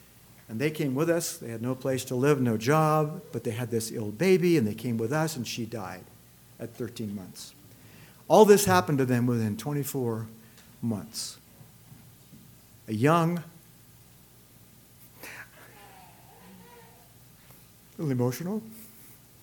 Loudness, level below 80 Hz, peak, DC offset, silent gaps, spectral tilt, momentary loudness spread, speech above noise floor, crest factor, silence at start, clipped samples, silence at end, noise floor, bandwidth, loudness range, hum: -27 LUFS; -64 dBFS; -4 dBFS; under 0.1%; none; -5.5 dB/octave; 21 LU; 29 dB; 24 dB; 0.5 s; under 0.1%; 0.3 s; -55 dBFS; 19 kHz; 22 LU; 60 Hz at -55 dBFS